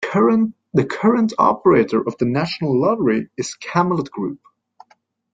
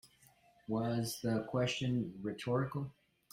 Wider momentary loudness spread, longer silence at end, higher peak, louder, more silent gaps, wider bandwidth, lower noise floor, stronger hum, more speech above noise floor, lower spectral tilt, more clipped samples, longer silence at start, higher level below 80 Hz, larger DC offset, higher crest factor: first, 12 LU vs 8 LU; first, 1 s vs 0.4 s; first, -2 dBFS vs -22 dBFS; first, -18 LUFS vs -37 LUFS; neither; second, 9.2 kHz vs 16 kHz; second, -59 dBFS vs -67 dBFS; neither; first, 41 dB vs 31 dB; about the same, -6.5 dB/octave vs -6 dB/octave; neither; about the same, 0 s vs 0.05 s; first, -58 dBFS vs -68 dBFS; neither; about the same, 16 dB vs 16 dB